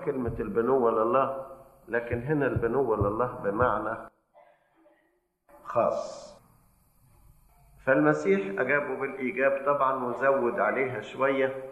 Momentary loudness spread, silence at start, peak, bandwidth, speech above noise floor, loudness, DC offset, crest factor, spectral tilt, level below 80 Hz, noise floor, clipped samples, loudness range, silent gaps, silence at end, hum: 9 LU; 0 s; -8 dBFS; 13 kHz; 45 dB; -27 LUFS; under 0.1%; 20 dB; -7.5 dB/octave; -54 dBFS; -71 dBFS; under 0.1%; 9 LU; none; 0 s; none